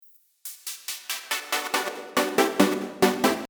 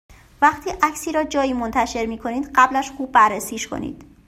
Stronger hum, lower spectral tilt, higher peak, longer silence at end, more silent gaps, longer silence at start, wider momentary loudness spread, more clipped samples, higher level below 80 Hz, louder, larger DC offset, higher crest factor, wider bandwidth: neither; about the same, -3 dB/octave vs -3.5 dB/octave; about the same, -2 dBFS vs -2 dBFS; second, 0.05 s vs 0.25 s; neither; first, 0.45 s vs 0.1 s; about the same, 13 LU vs 11 LU; neither; second, -64 dBFS vs -46 dBFS; second, -25 LUFS vs -20 LUFS; neither; about the same, 24 dB vs 20 dB; first, over 20 kHz vs 16 kHz